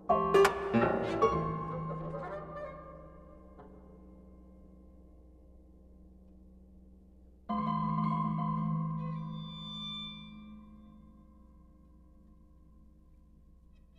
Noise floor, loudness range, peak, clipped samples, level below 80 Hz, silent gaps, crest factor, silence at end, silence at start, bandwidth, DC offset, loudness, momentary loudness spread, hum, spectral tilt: -59 dBFS; 23 LU; -12 dBFS; under 0.1%; -56 dBFS; none; 24 dB; 1.65 s; 0 s; 13 kHz; under 0.1%; -33 LUFS; 27 LU; none; -6.5 dB/octave